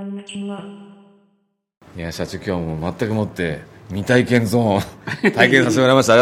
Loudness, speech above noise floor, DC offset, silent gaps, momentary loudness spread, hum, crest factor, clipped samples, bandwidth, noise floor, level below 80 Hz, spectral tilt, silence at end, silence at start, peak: -18 LUFS; 48 dB; under 0.1%; 1.77-1.81 s; 18 LU; none; 18 dB; under 0.1%; 16 kHz; -66 dBFS; -52 dBFS; -5.5 dB/octave; 0 s; 0 s; 0 dBFS